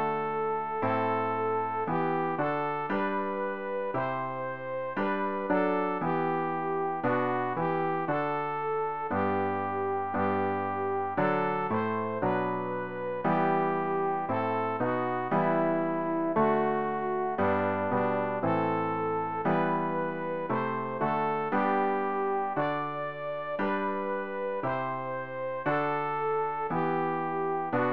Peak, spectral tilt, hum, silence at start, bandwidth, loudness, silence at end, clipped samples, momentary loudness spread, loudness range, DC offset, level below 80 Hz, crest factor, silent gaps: -14 dBFS; -9.5 dB/octave; none; 0 s; 5.4 kHz; -30 LUFS; 0 s; under 0.1%; 5 LU; 3 LU; 0.4%; -66 dBFS; 16 dB; none